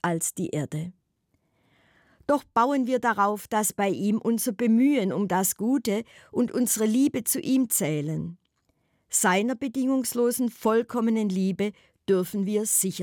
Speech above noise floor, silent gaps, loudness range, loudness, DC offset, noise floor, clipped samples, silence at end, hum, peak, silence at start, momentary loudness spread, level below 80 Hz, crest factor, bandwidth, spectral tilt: 48 dB; none; 3 LU; -25 LUFS; under 0.1%; -72 dBFS; under 0.1%; 0 s; none; -10 dBFS; 0.05 s; 8 LU; -68 dBFS; 16 dB; over 20 kHz; -4.5 dB/octave